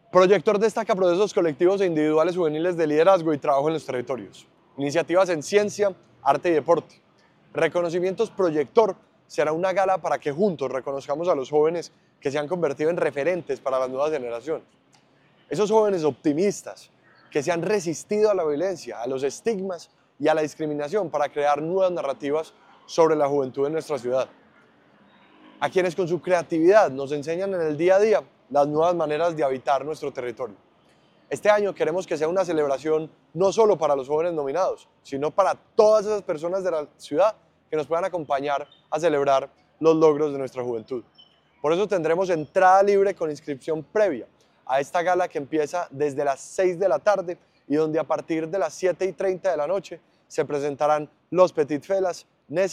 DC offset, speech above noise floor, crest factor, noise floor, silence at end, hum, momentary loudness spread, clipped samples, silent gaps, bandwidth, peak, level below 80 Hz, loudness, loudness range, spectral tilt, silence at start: under 0.1%; 37 dB; 20 dB; -59 dBFS; 0 s; none; 11 LU; under 0.1%; none; 12.5 kHz; -2 dBFS; -70 dBFS; -23 LUFS; 4 LU; -5.5 dB/octave; 0.15 s